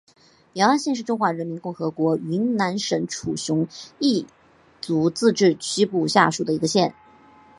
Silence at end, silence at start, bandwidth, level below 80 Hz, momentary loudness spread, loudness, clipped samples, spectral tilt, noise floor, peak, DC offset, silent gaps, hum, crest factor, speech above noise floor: 0.65 s; 0.55 s; 11.5 kHz; -64 dBFS; 10 LU; -22 LUFS; under 0.1%; -4.5 dB/octave; -51 dBFS; -2 dBFS; under 0.1%; none; none; 20 dB; 29 dB